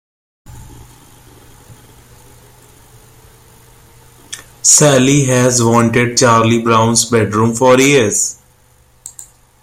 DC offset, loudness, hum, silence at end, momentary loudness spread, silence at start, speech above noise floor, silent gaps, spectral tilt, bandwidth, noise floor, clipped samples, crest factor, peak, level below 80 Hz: under 0.1%; -10 LUFS; none; 0.4 s; 23 LU; 0.5 s; 39 dB; none; -4 dB/octave; 16.5 kHz; -49 dBFS; under 0.1%; 14 dB; 0 dBFS; -46 dBFS